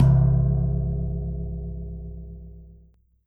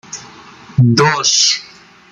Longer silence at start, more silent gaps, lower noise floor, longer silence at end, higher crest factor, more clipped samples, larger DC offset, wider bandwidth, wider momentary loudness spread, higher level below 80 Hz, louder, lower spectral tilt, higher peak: about the same, 0 s vs 0.1 s; neither; first, -56 dBFS vs -38 dBFS; about the same, 0.55 s vs 0.45 s; about the same, 16 dB vs 16 dB; neither; neither; second, 1.7 kHz vs 9.6 kHz; first, 22 LU vs 17 LU; first, -30 dBFS vs -50 dBFS; second, -24 LUFS vs -12 LUFS; first, -11.5 dB/octave vs -3.5 dB/octave; second, -8 dBFS vs 0 dBFS